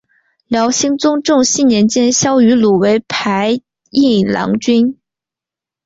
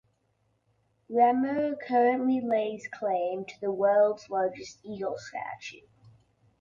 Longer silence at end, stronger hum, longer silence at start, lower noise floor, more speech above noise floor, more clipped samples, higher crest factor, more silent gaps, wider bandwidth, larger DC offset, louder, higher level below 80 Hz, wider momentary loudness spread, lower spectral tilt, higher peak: about the same, 0.95 s vs 0.85 s; neither; second, 0.5 s vs 1.1 s; first, -87 dBFS vs -73 dBFS; first, 75 dB vs 45 dB; neither; second, 12 dB vs 18 dB; neither; about the same, 8 kHz vs 7.6 kHz; neither; first, -13 LUFS vs -28 LUFS; first, -52 dBFS vs -72 dBFS; second, 6 LU vs 14 LU; second, -4 dB/octave vs -6 dB/octave; first, -2 dBFS vs -10 dBFS